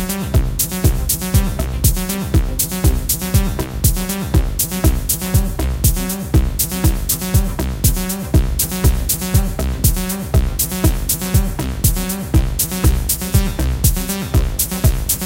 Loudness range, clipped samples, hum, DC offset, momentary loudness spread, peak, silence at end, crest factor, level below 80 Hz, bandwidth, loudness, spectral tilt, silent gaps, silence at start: 0 LU; under 0.1%; none; under 0.1%; 2 LU; 0 dBFS; 0 s; 16 dB; -20 dBFS; 17.5 kHz; -17 LUFS; -4.5 dB/octave; none; 0 s